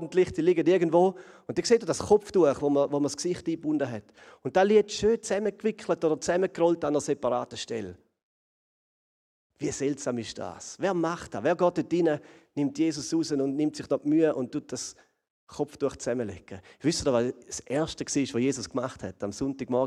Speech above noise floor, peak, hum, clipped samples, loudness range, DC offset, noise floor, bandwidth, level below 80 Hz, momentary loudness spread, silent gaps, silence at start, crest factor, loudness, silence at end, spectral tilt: over 63 dB; -10 dBFS; none; under 0.1%; 7 LU; under 0.1%; under -90 dBFS; 12 kHz; -60 dBFS; 13 LU; 8.23-9.50 s, 15.30-15.47 s; 0 s; 18 dB; -27 LUFS; 0 s; -5 dB/octave